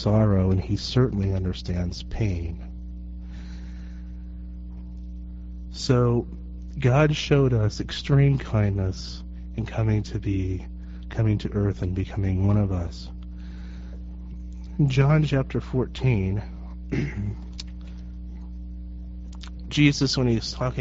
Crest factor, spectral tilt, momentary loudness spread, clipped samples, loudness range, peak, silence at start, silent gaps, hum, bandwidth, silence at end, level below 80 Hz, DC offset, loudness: 20 dB; -6.5 dB/octave; 19 LU; under 0.1%; 10 LU; -6 dBFS; 0 s; none; 60 Hz at -35 dBFS; 7.8 kHz; 0 s; -36 dBFS; under 0.1%; -24 LUFS